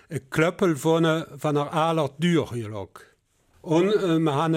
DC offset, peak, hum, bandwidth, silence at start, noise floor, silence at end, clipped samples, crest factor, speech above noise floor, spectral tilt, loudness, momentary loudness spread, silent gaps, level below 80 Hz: under 0.1%; -8 dBFS; none; 15.5 kHz; 0.1 s; -63 dBFS; 0 s; under 0.1%; 16 dB; 40 dB; -6.5 dB/octave; -23 LUFS; 12 LU; none; -60 dBFS